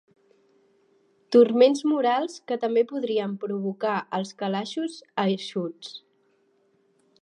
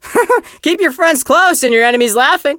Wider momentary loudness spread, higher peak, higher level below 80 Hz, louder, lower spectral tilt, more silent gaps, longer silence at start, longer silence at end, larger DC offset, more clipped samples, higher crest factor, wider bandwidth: first, 13 LU vs 4 LU; second, -6 dBFS vs 0 dBFS; second, -86 dBFS vs -56 dBFS; second, -25 LUFS vs -11 LUFS; first, -6 dB/octave vs -1.5 dB/octave; neither; first, 1.3 s vs 0.05 s; first, 1.25 s vs 0 s; neither; neither; first, 20 dB vs 12 dB; second, 10.5 kHz vs 17.5 kHz